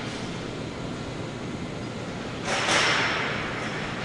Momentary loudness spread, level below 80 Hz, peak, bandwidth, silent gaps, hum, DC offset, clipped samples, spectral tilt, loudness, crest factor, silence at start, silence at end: 13 LU; -50 dBFS; -8 dBFS; 11.5 kHz; none; none; under 0.1%; under 0.1%; -3.5 dB/octave; -27 LUFS; 22 dB; 0 s; 0 s